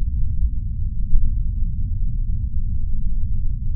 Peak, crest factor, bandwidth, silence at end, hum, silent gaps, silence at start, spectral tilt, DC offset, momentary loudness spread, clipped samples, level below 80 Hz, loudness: -2 dBFS; 16 dB; 0.3 kHz; 0 s; none; none; 0 s; -18 dB/octave; under 0.1%; 3 LU; under 0.1%; -20 dBFS; -26 LUFS